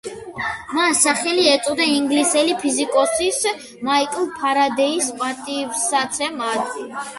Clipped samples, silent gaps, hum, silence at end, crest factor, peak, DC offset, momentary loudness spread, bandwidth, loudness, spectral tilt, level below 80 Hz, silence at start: under 0.1%; none; none; 0 s; 18 dB; -2 dBFS; under 0.1%; 10 LU; 12 kHz; -19 LUFS; -1 dB/octave; -58 dBFS; 0.05 s